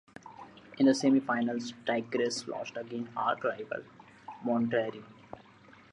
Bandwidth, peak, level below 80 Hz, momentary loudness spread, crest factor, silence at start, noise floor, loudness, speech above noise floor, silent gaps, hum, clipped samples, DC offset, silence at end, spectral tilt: 10.5 kHz; -14 dBFS; -76 dBFS; 24 LU; 18 dB; 0.25 s; -57 dBFS; -31 LUFS; 26 dB; none; none; under 0.1%; under 0.1%; 0.55 s; -5 dB/octave